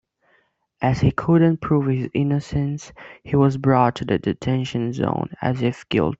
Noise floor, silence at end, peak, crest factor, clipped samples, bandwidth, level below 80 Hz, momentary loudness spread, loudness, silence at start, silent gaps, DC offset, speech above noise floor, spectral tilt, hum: -64 dBFS; 0.05 s; -2 dBFS; 18 dB; under 0.1%; 7.8 kHz; -46 dBFS; 8 LU; -21 LUFS; 0.8 s; none; under 0.1%; 44 dB; -8 dB/octave; none